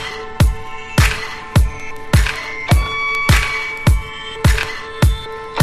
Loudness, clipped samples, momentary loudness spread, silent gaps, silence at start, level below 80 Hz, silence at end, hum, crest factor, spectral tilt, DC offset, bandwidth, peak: -17 LUFS; under 0.1%; 11 LU; none; 0 s; -20 dBFS; 0 s; none; 16 dB; -5 dB/octave; under 0.1%; 15.5 kHz; 0 dBFS